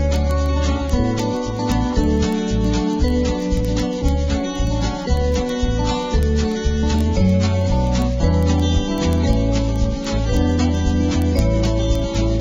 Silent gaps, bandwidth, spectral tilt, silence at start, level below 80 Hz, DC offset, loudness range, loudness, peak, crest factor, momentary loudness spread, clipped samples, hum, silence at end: none; 12.5 kHz; -6.5 dB/octave; 0 s; -22 dBFS; under 0.1%; 2 LU; -19 LUFS; -4 dBFS; 12 dB; 4 LU; under 0.1%; none; 0 s